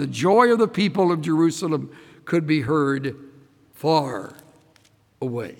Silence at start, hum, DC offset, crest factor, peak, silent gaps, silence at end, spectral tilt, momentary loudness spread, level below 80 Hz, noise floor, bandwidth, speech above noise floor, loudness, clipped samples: 0 s; none; under 0.1%; 18 dB; -4 dBFS; none; 0.05 s; -6 dB/octave; 15 LU; -66 dBFS; -58 dBFS; 17 kHz; 38 dB; -21 LUFS; under 0.1%